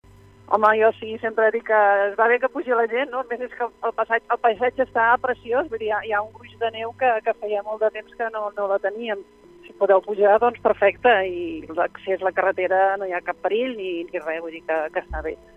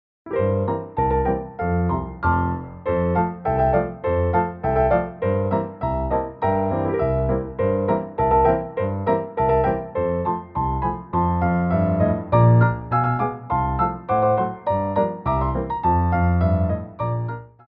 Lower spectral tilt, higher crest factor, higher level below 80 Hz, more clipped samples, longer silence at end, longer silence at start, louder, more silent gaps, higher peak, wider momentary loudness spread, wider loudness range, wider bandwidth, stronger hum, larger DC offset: second, -6 dB/octave vs -12.5 dB/octave; about the same, 18 dB vs 16 dB; second, -52 dBFS vs -34 dBFS; neither; about the same, 0.2 s vs 0.2 s; first, 0.5 s vs 0.25 s; about the same, -22 LUFS vs -22 LUFS; neither; about the same, -4 dBFS vs -4 dBFS; first, 11 LU vs 6 LU; first, 5 LU vs 2 LU; first, 6 kHz vs 4.9 kHz; neither; neither